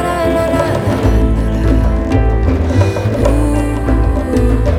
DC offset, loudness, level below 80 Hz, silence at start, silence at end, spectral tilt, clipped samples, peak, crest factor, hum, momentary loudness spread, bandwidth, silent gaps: under 0.1%; -14 LUFS; -16 dBFS; 0 s; 0 s; -7.5 dB/octave; under 0.1%; 0 dBFS; 12 dB; none; 2 LU; 13.5 kHz; none